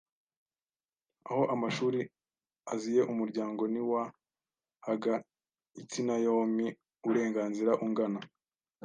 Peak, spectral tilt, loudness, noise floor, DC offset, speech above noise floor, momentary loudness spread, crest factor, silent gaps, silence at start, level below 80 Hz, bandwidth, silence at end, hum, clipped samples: -14 dBFS; -6 dB/octave; -33 LUFS; under -90 dBFS; under 0.1%; over 59 dB; 12 LU; 20 dB; none; 1.25 s; -84 dBFS; 9.8 kHz; 0.6 s; none; under 0.1%